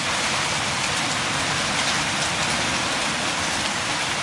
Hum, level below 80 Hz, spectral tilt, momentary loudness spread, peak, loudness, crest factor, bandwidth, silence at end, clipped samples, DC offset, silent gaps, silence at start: none; -50 dBFS; -1.5 dB/octave; 2 LU; -8 dBFS; -22 LUFS; 16 dB; 11.5 kHz; 0 s; under 0.1%; under 0.1%; none; 0 s